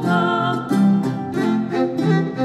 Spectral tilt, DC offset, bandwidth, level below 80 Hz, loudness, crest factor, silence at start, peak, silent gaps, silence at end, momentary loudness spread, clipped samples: -7.5 dB/octave; under 0.1%; 12.5 kHz; -58 dBFS; -19 LUFS; 12 dB; 0 s; -6 dBFS; none; 0 s; 4 LU; under 0.1%